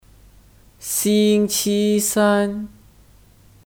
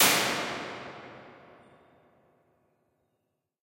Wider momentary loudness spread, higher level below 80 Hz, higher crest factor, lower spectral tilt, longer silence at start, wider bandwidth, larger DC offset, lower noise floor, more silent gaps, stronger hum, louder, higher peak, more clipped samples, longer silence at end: second, 15 LU vs 25 LU; first, -52 dBFS vs -74 dBFS; second, 16 dB vs 26 dB; first, -4 dB/octave vs -1 dB/octave; first, 0.8 s vs 0 s; first, 19.5 kHz vs 16.5 kHz; neither; second, -50 dBFS vs -80 dBFS; neither; neither; first, -18 LUFS vs -28 LUFS; first, -4 dBFS vs -8 dBFS; neither; second, 1 s vs 2.3 s